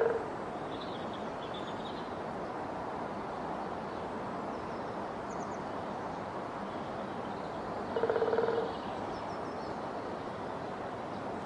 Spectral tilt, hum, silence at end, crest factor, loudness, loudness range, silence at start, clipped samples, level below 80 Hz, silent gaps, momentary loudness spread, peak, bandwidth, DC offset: -6 dB/octave; none; 0 s; 20 dB; -38 LUFS; 4 LU; 0 s; under 0.1%; -62 dBFS; none; 7 LU; -16 dBFS; 11 kHz; under 0.1%